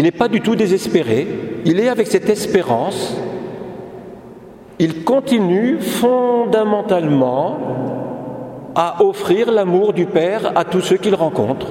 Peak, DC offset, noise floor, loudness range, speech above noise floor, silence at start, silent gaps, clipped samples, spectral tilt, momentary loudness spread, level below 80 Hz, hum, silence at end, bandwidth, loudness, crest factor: 0 dBFS; under 0.1%; -38 dBFS; 4 LU; 22 dB; 0 s; none; under 0.1%; -6 dB/octave; 13 LU; -54 dBFS; none; 0 s; 16.5 kHz; -16 LUFS; 16 dB